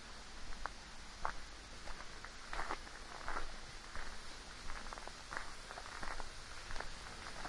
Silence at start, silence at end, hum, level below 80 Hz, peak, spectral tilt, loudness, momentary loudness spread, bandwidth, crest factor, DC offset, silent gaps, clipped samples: 0 s; 0 s; none; -50 dBFS; -20 dBFS; -2.5 dB/octave; -48 LUFS; 6 LU; 11.5 kHz; 26 dB; under 0.1%; none; under 0.1%